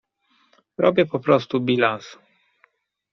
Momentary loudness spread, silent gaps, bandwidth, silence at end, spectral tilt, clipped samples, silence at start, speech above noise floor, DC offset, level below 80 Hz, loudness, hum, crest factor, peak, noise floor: 18 LU; none; 6.6 kHz; 1 s; -4.5 dB/octave; under 0.1%; 0.8 s; 44 dB; under 0.1%; -66 dBFS; -20 LUFS; none; 20 dB; -4 dBFS; -64 dBFS